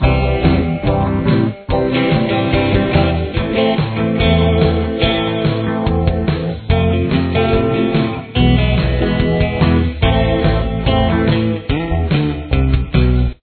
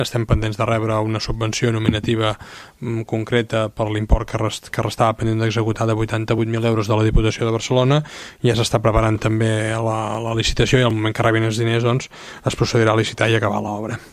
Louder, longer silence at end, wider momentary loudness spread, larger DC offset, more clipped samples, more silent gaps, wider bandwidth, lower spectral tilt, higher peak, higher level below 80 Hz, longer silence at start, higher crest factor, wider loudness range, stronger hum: first, -15 LUFS vs -19 LUFS; about the same, 0.1 s vs 0.05 s; second, 4 LU vs 7 LU; neither; neither; neither; second, 4.5 kHz vs 14 kHz; first, -10.5 dB/octave vs -6 dB/octave; about the same, 0 dBFS vs 0 dBFS; first, -22 dBFS vs -30 dBFS; about the same, 0 s vs 0 s; about the same, 14 dB vs 18 dB; about the same, 1 LU vs 3 LU; neither